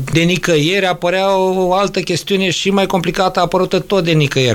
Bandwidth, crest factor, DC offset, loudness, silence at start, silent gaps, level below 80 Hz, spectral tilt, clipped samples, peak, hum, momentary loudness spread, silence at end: 17 kHz; 14 dB; under 0.1%; -14 LUFS; 0 s; none; -40 dBFS; -5 dB/octave; under 0.1%; 0 dBFS; none; 3 LU; 0 s